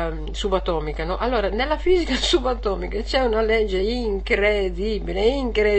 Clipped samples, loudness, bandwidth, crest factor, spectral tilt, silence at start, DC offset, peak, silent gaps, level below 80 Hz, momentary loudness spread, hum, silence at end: under 0.1%; -22 LUFS; 8.8 kHz; 16 dB; -5 dB/octave; 0 s; 0.4%; -6 dBFS; none; -30 dBFS; 6 LU; none; 0 s